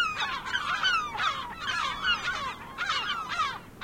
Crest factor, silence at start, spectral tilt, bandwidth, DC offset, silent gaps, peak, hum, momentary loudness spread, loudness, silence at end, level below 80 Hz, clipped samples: 16 dB; 0 s; -1 dB/octave; 16.5 kHz; under 0.1%; none; -14 dBFS; none; 7 LU; -29 LUFS; 0 s; -56 dBFS; under 0.1%